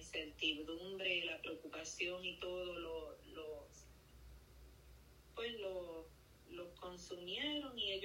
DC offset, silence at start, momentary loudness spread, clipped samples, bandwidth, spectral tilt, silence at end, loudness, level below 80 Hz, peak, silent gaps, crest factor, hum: under 0.1%; 0 s; 23 LU; under 0.1%; 16 kHz; -2.5 dB/octave; 0 s; -44 LUFS; -66 dBFS; -26 dBFS; none; 20 dB; none